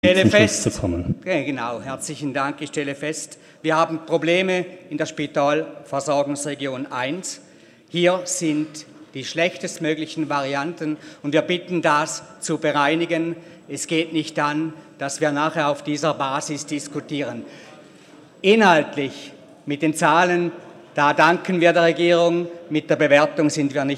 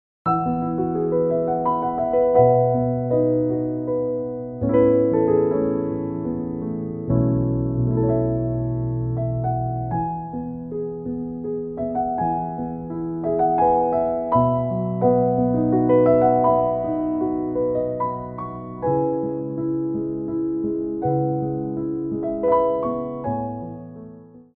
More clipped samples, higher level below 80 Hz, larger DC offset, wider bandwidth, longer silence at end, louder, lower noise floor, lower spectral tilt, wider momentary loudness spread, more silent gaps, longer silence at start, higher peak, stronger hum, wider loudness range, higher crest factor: neither; second, -54 dBFS vs -44 dBFS; neither; first, 14 kHz vs 3.2 kHz; second, 0 s vs 0.15 s; about the same, -21 LUFS vs -22 LUFS; first, -47 dBFS vs -43 dBFS; second, -4.5 dB/octave vs -14 dB/octave; first, 14 LU vs 11 LU; neither; second, 0.05 s vs 0.25 s; first, 0 dBFS vs -4 dBFS; neither; about the same, 6 LU vs 7 LU; about the same, 20 dB vs 18 dB